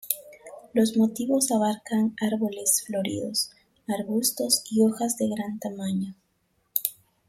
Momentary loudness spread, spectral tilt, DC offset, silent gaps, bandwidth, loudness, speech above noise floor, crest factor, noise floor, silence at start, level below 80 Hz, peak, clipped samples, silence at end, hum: 10 LU; -3.5 dB/octave; under 0.1%; none; 16.5 kHz; -26 LUFS; 46 dB; 24 dB; -71 dBFS; 0.05 s; -68 dBFS; -4 dBFS; under 0.1%; 0.35 s; none